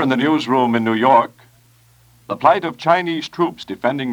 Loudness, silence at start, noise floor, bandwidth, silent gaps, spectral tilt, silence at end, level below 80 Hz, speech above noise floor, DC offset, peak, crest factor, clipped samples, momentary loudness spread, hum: -17 LUFS; 0 s; -52 dBFS; 20 kHz; none; -6 dB/octave; 0 s; -62 dBFS; 35 dB; under 0.1%; 0 dBFS; 18 dB; under 0.1%; 9 LU; none